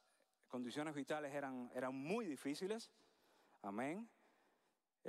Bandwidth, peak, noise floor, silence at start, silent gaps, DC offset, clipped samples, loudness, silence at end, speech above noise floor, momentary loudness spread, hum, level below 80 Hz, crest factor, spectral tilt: 15.5 kHz; -30 dBFS; -85 dBFS; 0.5 s; none; under 0.1%; under 0.1%; -47 LUFS; 0 s; 39 dB; 9 LU; none; under -90 dBFS; 18 dB; -5 dB/octave